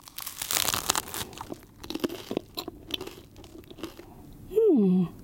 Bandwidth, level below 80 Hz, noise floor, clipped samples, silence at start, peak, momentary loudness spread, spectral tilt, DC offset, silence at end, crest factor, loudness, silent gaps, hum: 17 kHz; -56 dBFS; -48 dBFS; under 0.1%; 0.05 s; 0 dBFS; 25 LU; -4 dB/octave; under 0.1%; 0 s; 30 dB; -28 LUFS; none; none